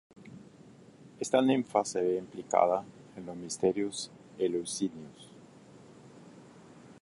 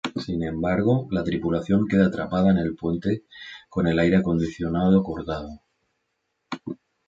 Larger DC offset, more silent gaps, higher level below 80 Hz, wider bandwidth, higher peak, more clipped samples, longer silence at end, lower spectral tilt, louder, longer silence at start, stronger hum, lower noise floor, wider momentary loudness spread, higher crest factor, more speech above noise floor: neither; neither; second, -72 dBFS vs -46 dBFS; first, 11.5 kHz vs 7.6 kHz; second, -10 dBFS vs -6 dBFS; neither; second, 0.1 s vs 0.35 s; second, -4.5 dB/octave vs -8 dB/octave; second, -31 LUFS vs -23 LUFS; first, 0.2 s vs 0.05 s; neither; second, -55 dBFS vs -76 dBFS; first, 25 LU vs 15 LU; first, 24 dB vs 18 dB; second, 25 dB vs 54 dB